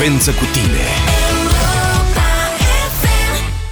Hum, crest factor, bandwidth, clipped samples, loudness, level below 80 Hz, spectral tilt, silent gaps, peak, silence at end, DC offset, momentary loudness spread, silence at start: none; 10 dB; over 20 kHz; under 0.1%; -14 LUFS; -16 dBFS; -4 dB/octave; none; -2 dBFS; 0 s; under 0.1%; 1 LU; 0 s